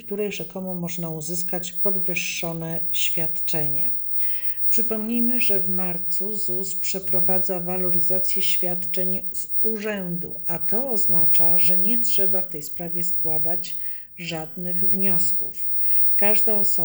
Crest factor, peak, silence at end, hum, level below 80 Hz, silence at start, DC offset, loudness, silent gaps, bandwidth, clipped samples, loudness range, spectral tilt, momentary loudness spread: 14 dB; -8 dBFS; 0 s; none; -58 dBFS; 0 s; under 0.1%; -18 LUFS; none; over 20 kHz; under 0.1%; 4 LU; -4 dB/octave; 12 LU